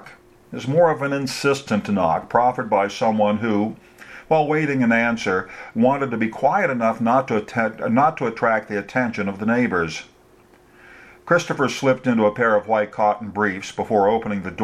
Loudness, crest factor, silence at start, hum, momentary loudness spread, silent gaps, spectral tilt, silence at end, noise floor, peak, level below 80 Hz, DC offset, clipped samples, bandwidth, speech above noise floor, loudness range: -20 LUFS; 18 dB; 0 s; none; 6 LU; none; -6 dB/octave; 0 s; -52 dBFS; -2 dBFS; -58 dBFS; under 0.1%; under 0.1%; 13.5 kHz; 32 dB; 3 LU